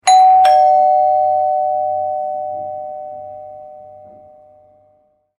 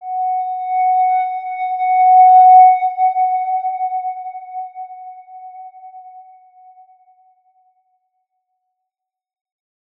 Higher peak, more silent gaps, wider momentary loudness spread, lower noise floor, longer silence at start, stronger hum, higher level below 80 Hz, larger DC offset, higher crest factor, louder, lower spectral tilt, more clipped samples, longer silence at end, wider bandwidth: about the same, 0 dBFS vs -2 dBFS; neither; about the same, 23 LU vs 25 LU; second, -57 dBFS vs -82 dBFS; about the same, 0.05 s vs 0 s; neither; first, -68 dBFS vs under -90 dBFS; neither; about the same, 14 dB vs 16 dB; about the same, -13 LUFS vs -13 LUFS; about the same, -1 dB/octave vs -2 dB/octave; neither; second, 1.5 s vs 3.75 s; first, 11 kHz vs 3.9 kHz